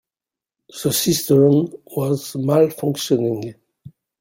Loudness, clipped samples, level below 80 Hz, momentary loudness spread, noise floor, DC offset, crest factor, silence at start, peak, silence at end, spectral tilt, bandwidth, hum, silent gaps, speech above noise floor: -19 LUFS; under 0.1%; -58 dBFS; 12 LU; -89 dBFS; under 0.1%; 16 dB; 0.75 s; -2 dBFS; 0.3 s; -5.5 dB/octave; 16.5 kHz; none; none; 71 dB